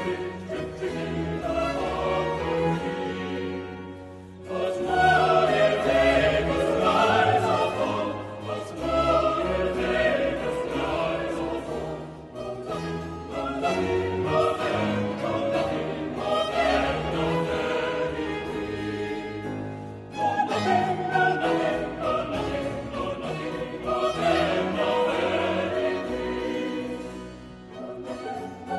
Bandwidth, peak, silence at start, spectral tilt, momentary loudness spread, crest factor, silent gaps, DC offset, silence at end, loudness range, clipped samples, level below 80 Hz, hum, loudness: 12 kHz; -8 dBFS; 0 s; -5.5 dB/octave; 13 LU; 18 dB; none; under 0.1%; 0 s; 7 LU; under 0.1%; -46 dBFS; none; -26 LUFS